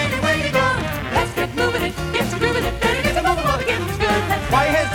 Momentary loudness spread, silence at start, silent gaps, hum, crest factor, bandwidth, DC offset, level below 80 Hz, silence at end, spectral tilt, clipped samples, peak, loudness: 4 LU; 0 s; none; none; 16 dB; 20 kHz; under 0.1%; -34 dBFS; 0 s; -4.5 dB/octave; under 0.1%; -4 dBFS; -19 LUFS